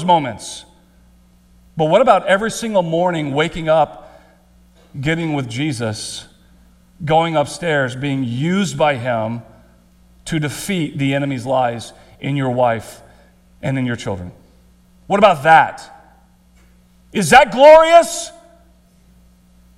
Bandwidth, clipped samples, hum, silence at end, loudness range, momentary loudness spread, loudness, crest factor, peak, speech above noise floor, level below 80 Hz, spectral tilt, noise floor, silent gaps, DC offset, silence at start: 14.5 kHz; 0.1%; none; 1.45 s; 9 LU; 19 LU; -16 LUFS; 18 dB; 0 dBFS; 35 dB; -48 dBFS; -5 dB/octave; -50 dBFS; none; under 0.1%; 0 s